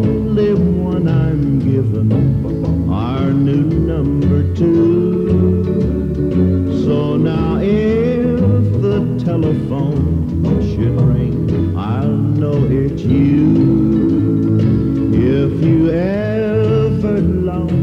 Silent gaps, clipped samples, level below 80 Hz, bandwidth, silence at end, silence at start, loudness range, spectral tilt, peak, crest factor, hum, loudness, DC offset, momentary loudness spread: none; under 0.1%; -30 dBFS; 6.8 kHz; 0 s; 0 s; 2 LU; -10.5 dB/octave; -2 dBFS; 12 dB; none; -15 LUFS; under 0.1%; 4 LU